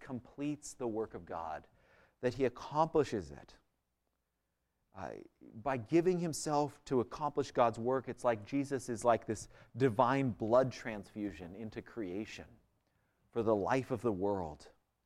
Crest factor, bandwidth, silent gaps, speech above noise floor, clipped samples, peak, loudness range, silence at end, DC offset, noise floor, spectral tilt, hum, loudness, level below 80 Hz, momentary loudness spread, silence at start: 22 dB; 14 kHz; none; 49 dB; under 0.1%; -14 dBFS; 5 LU; 0.35 s; under 0.1%; -85 dBFS; -6 dB/octave; none; -36 LUFS; -64 dBFS; 16 LU; 0 s